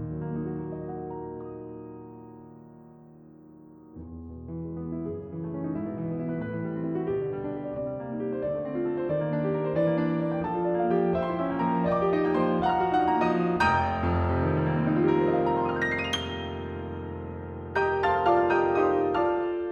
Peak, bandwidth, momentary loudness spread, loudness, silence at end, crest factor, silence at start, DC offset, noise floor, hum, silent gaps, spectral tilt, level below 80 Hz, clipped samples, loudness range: -10 dBFS; 10.5 kHz; 15 LU; -27 LUFS; 0 s; 16 dB; 0 s; under 0.1%; -50 dBFS; none; none; -7.5 dB/octave; -50 dBFS; under 0.1%; 15 LU